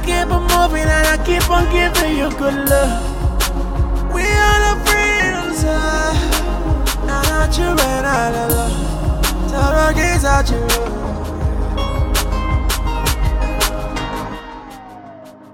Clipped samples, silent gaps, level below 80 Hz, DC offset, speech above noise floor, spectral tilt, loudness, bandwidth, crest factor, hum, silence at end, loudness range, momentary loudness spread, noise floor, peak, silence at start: under 0.1%; none; -20 dBFS; under 0.1%; 22 dB; -4 dB/octave; -16 LUFS; 17 kHz; 16 dB; none; 0 s; 4 LU; 9 LU; -37 dBFS; 0 dBFS; 0 s